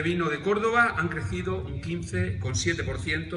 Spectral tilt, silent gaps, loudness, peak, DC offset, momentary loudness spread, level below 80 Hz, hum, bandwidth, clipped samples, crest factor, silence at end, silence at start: -5 dB/octave; none; -27 LUFS; -10 dBFS; under 0.1%; 9 LU; -44 dBFS; none; 11 kHz; under 0.1%; 18 dB; 0 s; 0 s